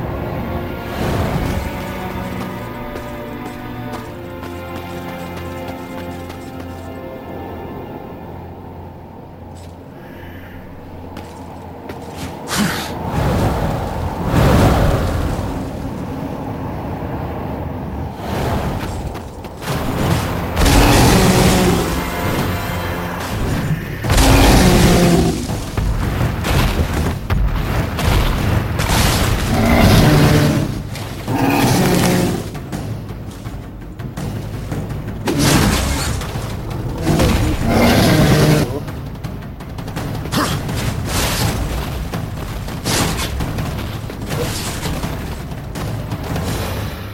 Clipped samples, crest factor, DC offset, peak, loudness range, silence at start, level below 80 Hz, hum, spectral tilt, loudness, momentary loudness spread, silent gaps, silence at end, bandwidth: under 0.1%; 18 dB; under 0.1%; 0 dBFS; 14 LU; 0 s; -26 dBFS; none; -5 dB/octave; -18 LUFS; 18 LU; none; 0 s; 16.5 kHz